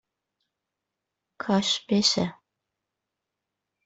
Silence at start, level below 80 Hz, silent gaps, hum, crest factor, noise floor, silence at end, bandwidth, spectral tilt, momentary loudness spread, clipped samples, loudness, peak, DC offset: 1.4 s; -66 dBFS; none; none; 22 dB; -85 dBFS; 1.55 s; 8.2 kHz; -4 dB/octave; 10 LU; under 0.1%; -24 LUFS; -8 dBFS; under 0.1%